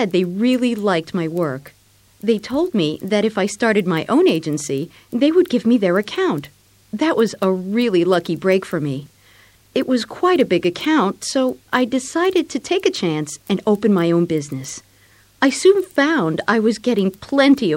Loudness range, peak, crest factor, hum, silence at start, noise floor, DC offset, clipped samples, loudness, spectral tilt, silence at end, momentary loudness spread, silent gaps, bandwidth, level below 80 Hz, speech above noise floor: 2 LU; -2 dBFS; 16 dB; none; 0 s; -52 dBFS; under 0.1%; under 0.1%; -18 LUFS; -5.5 dB/octave; 0 s; 8 LU; none; 16.5 kHz; -58 dBFS; 35 dB